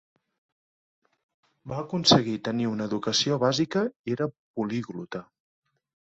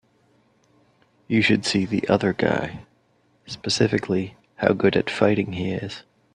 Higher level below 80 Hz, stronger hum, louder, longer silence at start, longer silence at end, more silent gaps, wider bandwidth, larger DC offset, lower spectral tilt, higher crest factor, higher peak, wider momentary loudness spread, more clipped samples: second, -64 dBFS vs -56 dBFS; neither; second, -26 LUFS vs -22 LUFS; first, 1.65 s vs 1.3 s; first, 0.9 s vs 0.35 s; first, 3.96-4.04 s, 4.39-4.54 s vs none; second, 8.2 kHz vs 10.5 kHz; neither; about the same, -4.5 dB/octave vs -5.5 dB/octave; about the same, 24 dB vs 24 dB; second, -4 dBFS vs 0 dBFS; about the same, 16 LU vs 15 LU; neither